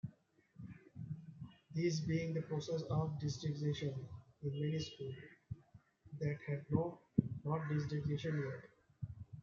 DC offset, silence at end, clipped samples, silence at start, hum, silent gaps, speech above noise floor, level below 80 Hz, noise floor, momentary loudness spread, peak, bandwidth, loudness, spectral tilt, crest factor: under 0.1%; 0 s; under 0.1%; 0.05 s; none; none; 29 dB; -68 dBFS; -69 dBFS; 15 LU; -16 dBFS; 7.4 kHz; -41 LUFS; -7 dB/octave; 26 dB